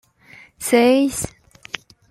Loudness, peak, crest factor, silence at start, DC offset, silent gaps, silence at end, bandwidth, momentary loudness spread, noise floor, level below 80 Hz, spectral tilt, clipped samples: -18 LUFS; -2 dBFS; 18 dB; 0.6 s; under 0.1%; none; 0.8 s; 15.5 kHz; 18 LU; -48 dBFS; -52 dBFS; -3.5 dB/octave; under 0.1%